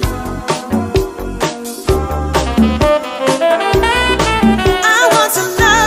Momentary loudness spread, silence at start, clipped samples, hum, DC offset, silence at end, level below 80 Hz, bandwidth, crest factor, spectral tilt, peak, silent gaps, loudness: 9 LU; 0 s; under 0.1%; none; under 0.1%; 0 s; -24 dBFS; 16 kHz; 12 dB; -4 dB/octave; 0 dBFS; none; -13 LUFS